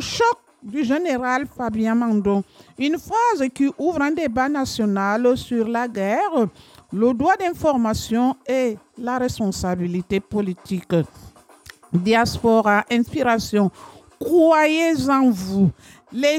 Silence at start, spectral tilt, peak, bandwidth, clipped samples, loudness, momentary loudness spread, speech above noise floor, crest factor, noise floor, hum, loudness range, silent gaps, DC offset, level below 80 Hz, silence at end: 0 s; -5.5 dB/octave; -6 dBFS; 16.5 kHz; under 0.1%; -20 LUFS; 8 LU; 27 dB; 14 dB; -46 dBFS; none; 5 LU; none; under 0.1%; -48 dBFS; 0 s